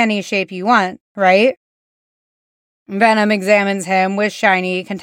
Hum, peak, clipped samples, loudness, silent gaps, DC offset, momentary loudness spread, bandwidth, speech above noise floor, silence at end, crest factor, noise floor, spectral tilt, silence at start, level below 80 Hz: none; 0 dBFS; under 0.1%; -15 LUFS; 1.00-1.15 s, 1.57-2.86 s; under 0.1%; 7 LU; 16 kHz; over 75 dB; 0 s; 16 dB; under -90 dBFS; -5 dB/octave; 0 s; -70 dBFS